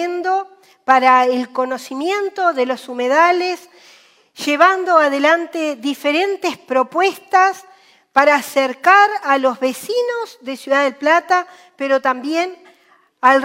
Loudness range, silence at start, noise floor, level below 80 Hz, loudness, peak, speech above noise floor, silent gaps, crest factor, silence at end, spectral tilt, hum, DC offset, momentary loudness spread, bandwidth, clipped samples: 3 LU; 0 s; -54 dBFS; -72 dBFS; -16 LUFS; 0 dBFS; 38 dB; none; 16 dB; 0 s; -2 dB/octave; none; under 0.1%; 11 LU; 16 kHz; under 0.1%